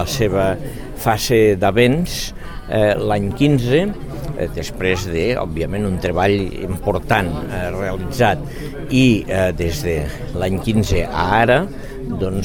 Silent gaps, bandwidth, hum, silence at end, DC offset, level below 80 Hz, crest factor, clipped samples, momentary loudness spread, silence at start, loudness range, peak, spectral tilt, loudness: none; 19 kHz; none; 0 s; under 0.1%; -30 dBFS; 18 dB; under 0.1%; 11 LU; 0 s; 3 LU; 0 dBFS; -6 dB/octave; -18 LUFS